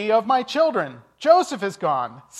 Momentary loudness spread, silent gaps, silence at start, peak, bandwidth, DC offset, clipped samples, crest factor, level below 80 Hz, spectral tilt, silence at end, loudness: 9 LU; none; 0 s; -2 dBFS; 12.5 kHz; under 0.1%; under 0.1%; 18 dB; -72 dBFS; -4.5 dB/octave; 0 s; -21 LUFS